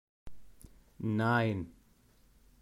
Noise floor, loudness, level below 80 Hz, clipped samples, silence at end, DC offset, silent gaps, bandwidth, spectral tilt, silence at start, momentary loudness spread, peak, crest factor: -65 dBFS; -32 LUFS; -60 dBFS; under 0.1%; 0.9 s; under 0.1%; none; 14.5 kHz; -7.5 dB/octave; 0.25 s; 12 LU; -18 dBFS; 18 dB